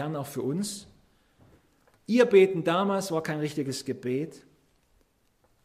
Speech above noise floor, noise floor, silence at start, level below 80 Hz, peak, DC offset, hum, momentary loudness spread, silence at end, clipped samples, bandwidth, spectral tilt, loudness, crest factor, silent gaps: 42 dB; -68 dBFS; 0 s; -70 dBFS; -8 dBFS; under 0.1%; none; 14 LU; 1.25 s; under 0.1%; 15.5 kHz; -5.5 dB/octave; -26 LUFS; 20 dB; none